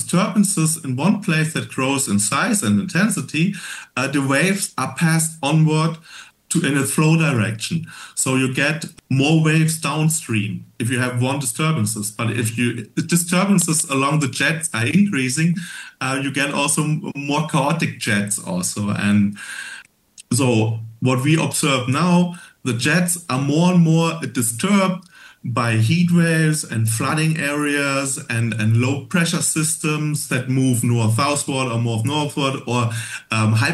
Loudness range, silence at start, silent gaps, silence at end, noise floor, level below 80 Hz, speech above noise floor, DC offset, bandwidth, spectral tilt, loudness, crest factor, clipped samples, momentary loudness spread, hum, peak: 2 LU; 0 s; none; 0 s; -48 dBFS; -64 dBFS; 29 dB; under 0.1%; 12.5 kHz; -4.5 dB/octave; -19 LUFS; 16 dB; under 0.1%; 7 LU; none; -4 dBFS